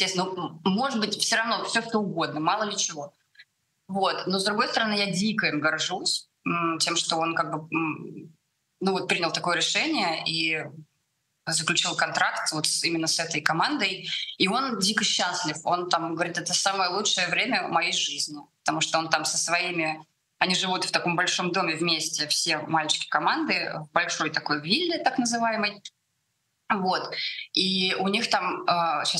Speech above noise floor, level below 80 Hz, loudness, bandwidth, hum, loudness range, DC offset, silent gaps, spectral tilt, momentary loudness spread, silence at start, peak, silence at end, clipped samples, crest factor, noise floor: 50 dB; -74 dBFS; -25 LUFS; 13 kHz; none; 2 LU; under 0.1%; none; -2.5 dB/octave; 6 LU; 0 s; -4 dBFS; 0 s; under 0.1%; 24 dB; -76 dBFS